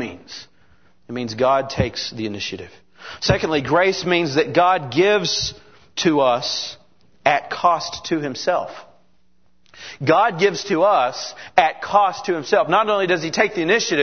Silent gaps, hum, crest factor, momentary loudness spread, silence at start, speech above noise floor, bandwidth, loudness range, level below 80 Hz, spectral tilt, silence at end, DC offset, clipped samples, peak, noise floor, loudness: none; none; 20 dB; 13 LU; 0 s; 45 dB; 6.6 kHz; 5 LU; -48 dBFS; -4 dB/octave; 0 s; 0.3%; under 0.1%; 0 dBFS; -64 dBFS; -19 LUFS